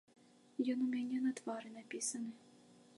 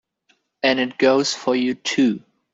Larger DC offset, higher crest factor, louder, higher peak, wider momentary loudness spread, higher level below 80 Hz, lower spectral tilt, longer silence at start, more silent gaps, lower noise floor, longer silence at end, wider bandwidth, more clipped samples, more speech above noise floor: neither; about the same, 18 dB vs 16 dB; second, -41 LUFS vs -20 LUFS; second, -24 dBFS vs -4 dBFS; first, 12 LU vs 5 LU; second, under -90 dBFS vs -66 dBFS; about the same, -3 dB/octave vs -3.5 dB/octave; about the same, 0.6 s vs 0.65 s; neither; about the same, -64 dBFS vs -65 dBFS; about the same, 0.25 s vs 0.35 s; first, 11.5 kHz vs 8 kHz; neither; second, 24 dB vs 46 dB